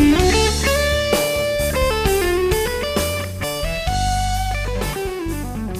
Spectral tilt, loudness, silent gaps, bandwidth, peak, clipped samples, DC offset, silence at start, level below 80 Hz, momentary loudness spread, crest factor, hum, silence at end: -4.5 dB/octave; -19 LUFS; none; 15.5 kHz; -4 dBFS; under 0.1%; under 0.1%; 0 s; -26 dBFS; 8 LU; 16 dB; none; 0 s